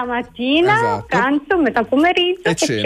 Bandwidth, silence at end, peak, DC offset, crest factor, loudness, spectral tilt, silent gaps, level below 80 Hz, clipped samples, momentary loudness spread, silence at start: 14 kHz; 0 s; -6 dBFS; under 0.1%; 10 dB; -16 LUFS; -4 dB/octave; none; -48 dBFS; under 0.1%; 4 LU; 0 s